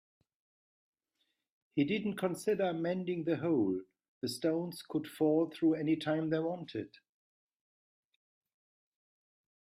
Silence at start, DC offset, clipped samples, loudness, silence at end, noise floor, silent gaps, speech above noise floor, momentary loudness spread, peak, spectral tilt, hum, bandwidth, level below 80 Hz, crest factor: 1.75 s; under 0.1%; under 0.1%; -34 LUFS; 2.75 s; -82 dBFS; 4.08-4.21 s; 49 dB; 10 LU; -18 dBFS; -6.5 dB/octave; none; 15 kHz; -78 dBFS; 18 dB